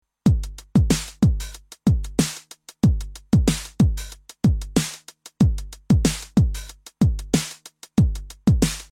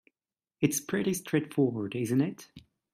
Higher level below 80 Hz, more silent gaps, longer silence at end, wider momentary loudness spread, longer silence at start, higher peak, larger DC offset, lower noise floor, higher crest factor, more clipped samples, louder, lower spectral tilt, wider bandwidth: first, -28 dBFS vs -70 dBFS; neither; second, 0.1 s vs 0.35 s; first, 13 LU vs 5 LU; second, 0.25 s vs 0.6 s; first, -4 dBFS vs -10 dBFS; neither; second, -43 dBFS vs under -90 dBFS; about the same, 18 dB vs 20 dB; neither; first, -22 LUFS vs -30 LUFS; about the same, -6 dB/octave vs -5.5 dB/octave; about the same, 16.5 kHz vs 16 kHz